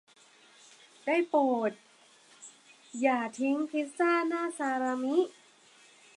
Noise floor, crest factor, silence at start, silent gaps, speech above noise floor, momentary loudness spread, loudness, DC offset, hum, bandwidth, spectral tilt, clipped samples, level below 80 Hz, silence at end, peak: -60 dBFS; 18 dB; 1.05 s; none; 31 dB; 18 LU; -30 LUFS; under 0.1%; none; 11.5 kHz; -4 dB/octave; under 0.1%; -88 dBFS; 0.9 s; -14 dBFS